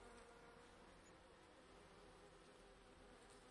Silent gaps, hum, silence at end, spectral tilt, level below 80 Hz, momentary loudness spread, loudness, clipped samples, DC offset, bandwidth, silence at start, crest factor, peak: none; none; 0 s; -4 dB/octave; -74 dBFS; 3 LU; -65 LUFS; under 0.1%; under 0.1%; 11 kHz; 0 s; 16 dB; -50 dBFS